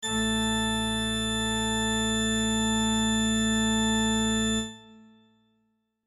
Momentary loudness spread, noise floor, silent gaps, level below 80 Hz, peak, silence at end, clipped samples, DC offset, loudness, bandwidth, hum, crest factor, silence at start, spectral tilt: 3 LU; -74 dBFS; none; -44 dBFS; -16 dBFS; 1.1 s; under 0.1%; under 0.1%; -25 LUFS; 13 kHz; none; 12 dB; 0 s; -3 dB/octave